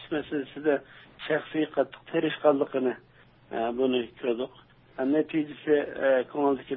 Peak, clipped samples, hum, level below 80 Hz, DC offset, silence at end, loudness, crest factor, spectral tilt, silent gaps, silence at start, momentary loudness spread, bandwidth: -8 dBFS; under 0.1%; none; -66 dBFS; under 0.1%; 0 s; -28 LUFS; 20 dB; -9.5 dB/octave; none; 0 s; 9 LU; 4.2 kHz